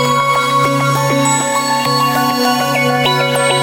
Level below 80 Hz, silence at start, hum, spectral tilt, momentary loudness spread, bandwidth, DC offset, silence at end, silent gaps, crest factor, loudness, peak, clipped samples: -52 dBFS; 0 s; none; -3.5 dB/octave; 1 LU; 17.5 kHz; under 0.1%; 0 s; none; 12 dB; -13 LUFS; -2 dBFS; under 0.1%